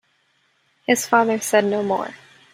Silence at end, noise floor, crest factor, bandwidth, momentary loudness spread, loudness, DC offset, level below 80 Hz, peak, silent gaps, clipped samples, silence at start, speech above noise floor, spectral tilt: 0.4 s; -64 dBFS; 20 dB; 16 kHz; 12 LU; -19 LUFS; under 0.1%; -68 dBFS; -2 dBFS; none; under 0.1%; 0.9 s; 45 dB; -3.5 dB/octave